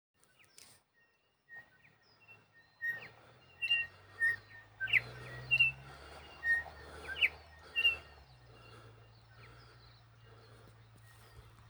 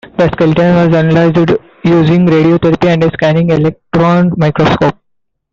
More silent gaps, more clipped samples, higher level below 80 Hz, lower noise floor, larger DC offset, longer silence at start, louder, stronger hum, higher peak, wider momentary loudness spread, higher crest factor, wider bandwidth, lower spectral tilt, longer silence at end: neither; neither; second, -66 dBFS vs -38 dBFS; first, -74 dBFS vs -66 dBFS; neither; first, 1.5 s vs 0.05 s; second, -33 LUFS vs -10 LUFS; neither; second, -16 dBFS vs -2 dBFS; first, 25 LU vs 5 LU; first, 24 dB vs 8 dB; first, over 20 kHz vs 7.2 kHz; second, -2 dB/octave vs -8.5 dB/octave; second, 0.2 s vs 0.6 s